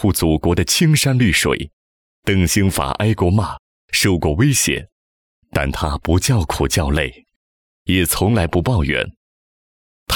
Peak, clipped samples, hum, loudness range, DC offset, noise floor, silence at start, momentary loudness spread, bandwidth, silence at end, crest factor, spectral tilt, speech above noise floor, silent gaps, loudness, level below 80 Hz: -4 dBFS; under 0.1%; none; 3 LU; under 0.1%; under -90 dBFS; 0 s; 10 LU; over 20 kHz; 0 s; 14 dB; -4.5 dB/octave; over 74 dB; 1.73-2.22 s, 3.59-3.88 s, 4.92-5.42 s, 7.36-7.86 s, 9.17-10.06 s; -17 LUFS; -30 dBFS